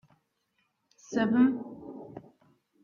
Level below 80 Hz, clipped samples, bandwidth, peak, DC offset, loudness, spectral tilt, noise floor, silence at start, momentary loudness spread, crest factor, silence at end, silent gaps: -70 dBFS; under 0.1%; 7.2 kHz; -12 dBFS; under 0.1%; -27 LUFS; -6.5 dB/octave; -76 dBFS; 1.1 s; 23 LU; 20 dB; 0.65 s; none